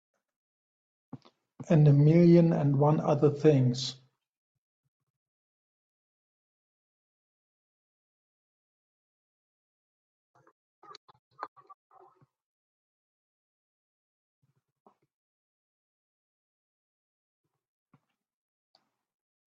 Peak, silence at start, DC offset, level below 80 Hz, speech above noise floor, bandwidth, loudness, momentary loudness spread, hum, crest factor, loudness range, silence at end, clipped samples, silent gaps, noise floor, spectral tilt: -10 dBFS; 1.15 s; under 0.1%; -70 dBFS; 48 dB; 7.8 kHz; -24 LUFS; 25 LU; none; 22 dB; 9 LU; 8.1 s; under 0.1%; 4.37-10.34 s, 10.52-10.82 s, 10.97-11.08 s, 11.19-11.31 s; -71 dBFS; -8.5 dB/octave